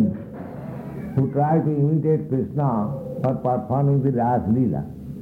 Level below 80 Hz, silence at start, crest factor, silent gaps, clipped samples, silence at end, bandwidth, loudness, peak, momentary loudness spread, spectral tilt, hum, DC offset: -50 dBFS; 0 s; 14 dB; none; under 0.1%; 0 s; 2.9 kHz; -22 LUFS; -8 dBFS; 14 LU; -12 dB/octave; none; under 0.1%